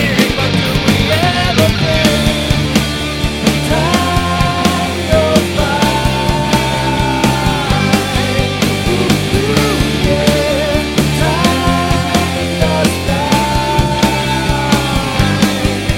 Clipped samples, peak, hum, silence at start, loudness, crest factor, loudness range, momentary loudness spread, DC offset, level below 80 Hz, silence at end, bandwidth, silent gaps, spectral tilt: under 0.1%; 0 dBFS; none; 0 s; -13 LUFS; 12 dB; 1 LU; 3 LU; under 0.1%; -24 dBFS; 0 s; 16.5 kHz; none; -5 dB/octave